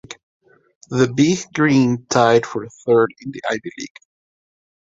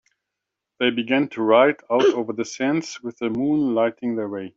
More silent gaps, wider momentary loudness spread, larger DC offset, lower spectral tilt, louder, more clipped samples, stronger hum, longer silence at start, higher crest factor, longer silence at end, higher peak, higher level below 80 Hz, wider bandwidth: first, 0.23-0.40 s, 0.75-0.81 s vs none; first, 18 LU vs 10 LU; neither; about the same, -5.5 dB/octave vs -5 dB/octave; first, -18 LUFS vs -21 LUFS; neither; neither; second, 0.1 s vs 0.8 s; about the same, 18 dB vs 18 dB; first, 0.95 s vs 0.1 s; about the same, -2 dBFS vs -4 dBFS; first, -58 dBFS vs -66 dBFS; about the same, 7.8 kHz vs 7.8 kHz